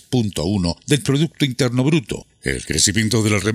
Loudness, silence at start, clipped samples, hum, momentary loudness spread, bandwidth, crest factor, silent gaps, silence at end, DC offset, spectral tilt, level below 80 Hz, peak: -19 LUFS; 0.1 s; under 0.1%; none; 9 LU; 16 kHz; 18 dB; none; 0 s; under 0.1%; -4.5 dB/octave; -42 dBFS; 0 dBFS